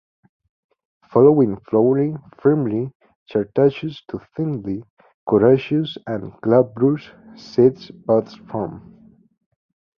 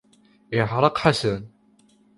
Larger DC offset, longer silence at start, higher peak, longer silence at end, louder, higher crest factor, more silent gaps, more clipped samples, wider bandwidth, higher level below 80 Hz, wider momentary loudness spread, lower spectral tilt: neither; first, 1.1 s vs 0.5 s; about the same, -2 dBFS vs -2 dBFS; first, 1.2 s vs 0.7 s; first, -19 LUFS vs -22 LUFS; about the same, 18 dB vs 22 dB; first, 2.95-3.00 s, 3.16-3.26 s, 4.90-4.97 s, 5.14-5.27 s vs none; neither; second, 6.4 kHz vs 11.5 kHz; about the same, -56 dBFS vs -52 dBFS; first, 15 LU vs 9 LU; first, -9.5 dB/octave vs -6 dB/octave